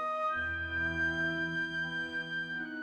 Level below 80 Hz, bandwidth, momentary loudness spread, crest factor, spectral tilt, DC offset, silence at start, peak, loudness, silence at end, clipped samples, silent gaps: -58 dBFS; 10 kHz; 5 LU; 12 dB; -5.5 dB/octave; under 0.1%; 0 s; -24 dBFS; -33 LUFS; 0 s; under 0.1%; none